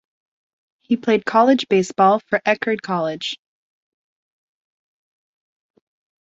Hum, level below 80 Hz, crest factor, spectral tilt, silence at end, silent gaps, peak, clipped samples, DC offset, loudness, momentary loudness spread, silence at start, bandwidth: none; -68 dBFS; 20 dB; -5 dB/octave; 2.85 s; none; -2 dBFS; under 0.1%; under 0.1%; -18 LUFS; 10 LU; 0.9 s; 8 kHz